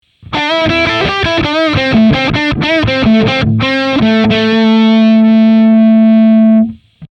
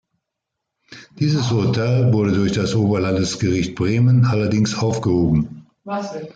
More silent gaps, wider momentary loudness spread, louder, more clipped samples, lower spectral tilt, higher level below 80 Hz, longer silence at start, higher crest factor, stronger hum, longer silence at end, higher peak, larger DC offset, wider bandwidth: neither; second, 5 LU vs 11 LU; first, -9 LUFS vs -19 LUFS; neither; about the same, -7 dB/octave vs -6.5 dB/octave; first, -34 dBFS vs -46 dBFS; second, 0.3 s vs 0.9 s; about the same, 8 dB vs 12 dB; neither; about the same, 0.05 s vs 0.05 s; first, 0 dBFS vs -6 dBFS; neither; second, 6.6 kHz vs 9 kHz